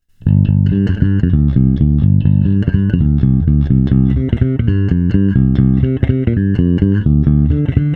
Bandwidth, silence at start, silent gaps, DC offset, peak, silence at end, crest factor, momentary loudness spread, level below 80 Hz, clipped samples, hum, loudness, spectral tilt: 3.9 kHz; 0.25 s; none; under 0.1%; 0 dBFS; 0 s; 12 dB; 3 LU; -20 dBFS; under 0.1%; none; -13 LUFS; -11.5 dB/octave